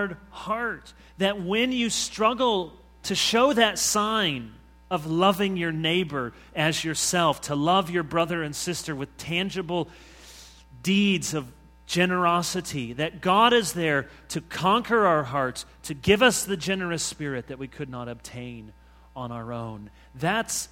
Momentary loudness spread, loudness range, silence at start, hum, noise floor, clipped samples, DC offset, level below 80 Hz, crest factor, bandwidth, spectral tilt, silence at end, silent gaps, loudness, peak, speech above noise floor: 16 LU; 5 LU; 0 s; none; -48 dBFS; under 0.1%; under 0.1%; -54 dBFS; 22 dB; 16.5 kHz; -3.5 dB/octave; 0.05 s; none; -25 LUFS; -4 dBFS; 23 dB